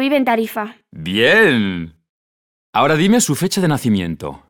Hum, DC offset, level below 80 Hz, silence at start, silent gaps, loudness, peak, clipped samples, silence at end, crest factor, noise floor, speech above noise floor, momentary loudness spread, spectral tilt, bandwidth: none; under 0.1%; -50 dBFS; 0 s; 2.09-2.73 s; -15 LUFS; -2 dBFS; under 0.1%; 0.15 s; 16 dB; under -90 dBFS; over 74 dB; 16 LU; -4.5 dB/octave; 19 kHz